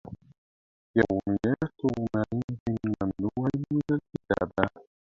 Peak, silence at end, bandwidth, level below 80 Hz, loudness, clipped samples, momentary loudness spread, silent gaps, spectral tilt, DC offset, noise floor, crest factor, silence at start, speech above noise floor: -2 dBFS; 0.25 s; 7.4 kHz; -52 dBFS; -29 LUFS; under 0.1%; 5 LU; 0.38-0.94 s, 2.44-2.48 s, 2.60-2.66 s; -9 dB/octave; under 0.1%; under -90 dBFS; 26 dB; 0.05 s; over 63 dB